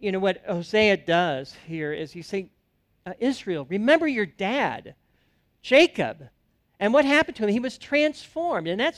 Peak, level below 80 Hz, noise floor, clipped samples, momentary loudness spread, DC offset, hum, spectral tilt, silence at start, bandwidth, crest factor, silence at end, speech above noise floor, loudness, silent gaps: -4 dBFS; -60 dBFS; -69 dBFS; under 0.1%; 14 LU; under 0.1%; none; -5 dB/octave; 0 s; 12.5 kHz; 20 dB; 0.05 s; 45 dB; -24 LUFS; none